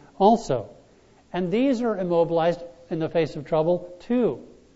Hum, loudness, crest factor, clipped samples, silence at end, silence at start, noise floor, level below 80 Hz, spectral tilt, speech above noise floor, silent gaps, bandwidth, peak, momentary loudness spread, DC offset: none; -24 LUFS; 20 dB; under 0.1%; 0.3 s; 0.2 s; -55 dBFS; -54 dBFS; -7 dB/octave; 33 dB; none; 8 kHz; -4 dBFS; 13 LU; under 0.1%